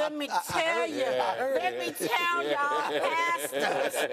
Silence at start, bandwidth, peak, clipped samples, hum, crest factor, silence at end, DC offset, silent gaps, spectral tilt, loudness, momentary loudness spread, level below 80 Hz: 0 s; 16 kHz; -14 dBFS; under 0.1%; none; 16 dB; 0 s; under 0.1%; none; -2.5 dB/octave; -28 LUFS; 2 LU; -70 dBFS